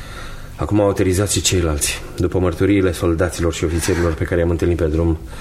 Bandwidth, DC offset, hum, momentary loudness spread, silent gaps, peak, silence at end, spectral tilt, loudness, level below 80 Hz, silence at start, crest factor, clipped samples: 15.5 kHz; under 0.1%; none; 5 LU; none; -2 dBFS; 0 s; -5 dB/octave; -18 LUFS; -30 dBFS; 0 s; 14 dB; under 0.1%